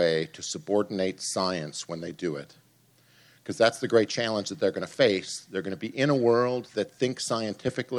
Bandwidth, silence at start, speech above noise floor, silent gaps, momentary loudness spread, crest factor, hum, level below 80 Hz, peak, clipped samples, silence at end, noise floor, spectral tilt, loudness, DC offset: 13 kHz; 0 s; 35 dB; none; 11 LU; 22 dB; none; -72 dBFS; -6 dBFS; under 0.1%; 0 s; -62 dBFS; -4.5 dB/octave; -27 LUFS; under 0.1%